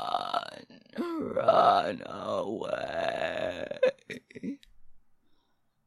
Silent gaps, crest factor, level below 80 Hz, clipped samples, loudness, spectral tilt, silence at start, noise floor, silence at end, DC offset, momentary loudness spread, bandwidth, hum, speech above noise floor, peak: none; 22 dB; -68 dBFS; under 0.1%; -29 LUFS; -5 dB/octave; 0 s; -70 dBFS; 0.9 s; under 0.1%; 20 LU; 12 kHz; none; 36 dB; -8 dBFS